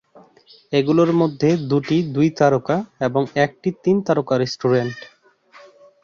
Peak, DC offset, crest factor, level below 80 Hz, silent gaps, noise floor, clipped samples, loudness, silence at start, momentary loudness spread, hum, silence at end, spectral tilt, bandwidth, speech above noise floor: -2 dBFS; under 0.1%; 18 dB; -60 dBFS; none; -50 dBFS; under 0.1%; -19 LUFS; 0.7 s; 6 LU; none; 1 s; -7 dB/octave; 7.2 kHz; 31 dB